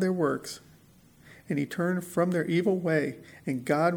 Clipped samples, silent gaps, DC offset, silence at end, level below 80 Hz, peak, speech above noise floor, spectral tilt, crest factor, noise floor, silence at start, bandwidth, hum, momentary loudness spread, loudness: under 0.1%; none; under 0.1%; 0 s; -68 dBFS; -10 dBFS; 30 dB; -6.5 dB/octave; 18 dB; -57 dBFS; 0 s; 19.5 kHz; none; 10 LU; -29 LUFS